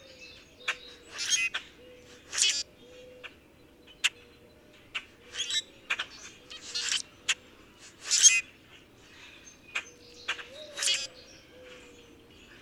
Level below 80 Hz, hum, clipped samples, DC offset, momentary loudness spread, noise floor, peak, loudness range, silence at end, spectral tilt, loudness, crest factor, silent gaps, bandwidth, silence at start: -68 dBFS; none; under 0.1%; under 0.1%; 24 LU; -57 dBFS; -6 dBFS; 8 LU; 0.05 s; 2.5 dB/octave; -28 LUFS; 28 dB; none; 18 kHz; 0.1 s